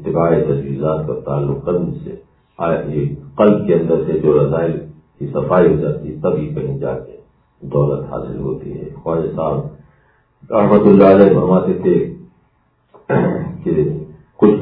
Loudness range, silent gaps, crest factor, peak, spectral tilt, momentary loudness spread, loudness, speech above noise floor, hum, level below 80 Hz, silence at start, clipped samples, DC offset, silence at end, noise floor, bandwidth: 8 LU; none; 16 dB; 0 dBFS; -12.5 dB/octave; 15 LU; -16 LUFS; 44 dB; none; -42 dBFS; 0 s; under 0.1%; under 0.1%; 0 s; -59 dBFS; 4.7 kHz